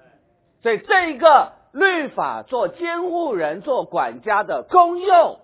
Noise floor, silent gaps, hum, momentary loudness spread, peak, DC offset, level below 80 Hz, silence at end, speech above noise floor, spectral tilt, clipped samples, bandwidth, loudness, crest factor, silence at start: -60 dBFS; none; none; 10 LU; 0 dBFS; under 0.1%; -62 dBFS; 0.1 s; 42 dB; -7.5 dB/octave; under 0.1%; 4 kHz; -19 LUFS; 18 dB; 0.65 s